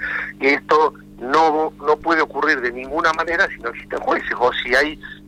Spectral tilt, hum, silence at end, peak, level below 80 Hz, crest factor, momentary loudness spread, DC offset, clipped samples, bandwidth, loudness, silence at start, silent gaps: -4 dB/octave; 50 Hz at -45 dBFS; 0 s; -6 dBFS; -48 dBFS; 14 dB; 7 LU; under 0.1%; under 0.1%; 13 kHz; -18 LUFS; 0 s; none